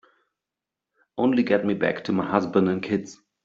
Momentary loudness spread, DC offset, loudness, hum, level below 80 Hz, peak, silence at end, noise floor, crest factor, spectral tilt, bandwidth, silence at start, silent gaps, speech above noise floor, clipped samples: 7 LU; under 0.1%; -24 LUFS; none; -64 dBFS; -4 dBFS; 0.3 s; -87 dBFS; 20 dB; -7 dB/octave; 7.6 kHz; 1.15 s; none; 65 dB; under 0.1%